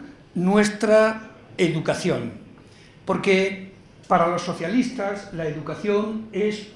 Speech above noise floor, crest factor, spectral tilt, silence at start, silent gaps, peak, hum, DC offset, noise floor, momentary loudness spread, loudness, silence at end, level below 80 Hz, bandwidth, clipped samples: 26 dB; 18 dB; -5.5 dB/octave; 0 s; none; -4 dBFS; none; under 0.1%; -48 dBFS; 15 LU; -23 LUFS; 0.05 s; -56 dBFS; 12 kHz; under 0.1%